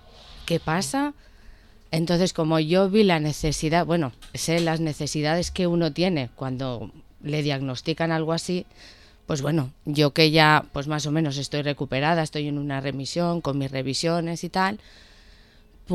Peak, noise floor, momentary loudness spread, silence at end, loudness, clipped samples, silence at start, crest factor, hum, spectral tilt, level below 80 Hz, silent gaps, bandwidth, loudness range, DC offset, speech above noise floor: -2 dBFS; -52 dBFS; 11 LU; 0 s; -24 LUFS; under 0.1%; 0.15 s; 22 dB; none; -5 dB/octave; -48 dBFS; none; 13 kHz; 5 LU; under 0.1%; 28 dB